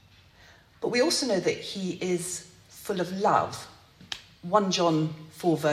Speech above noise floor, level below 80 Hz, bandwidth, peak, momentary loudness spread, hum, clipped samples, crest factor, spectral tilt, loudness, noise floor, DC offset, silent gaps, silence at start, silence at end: 29 dB; -66 dBFS; 16 kHz; -6 dBFS; 15 LU; none; under 0.1%; 22 dB; -4.5 dB/octave; -27 LUFS; -55 dBFS; under 0.1%; none; 0.8 s; 0 s